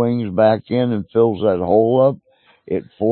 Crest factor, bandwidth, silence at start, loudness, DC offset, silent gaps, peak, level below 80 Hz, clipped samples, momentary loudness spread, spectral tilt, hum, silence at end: 14 dB; 4.4 kHz; 0 s; -17 LUFS; under 0.1%; none; -2 dBFS; -54 dBFS; under 0.1%; 11 LU; -13 dB/octave; none; 0 s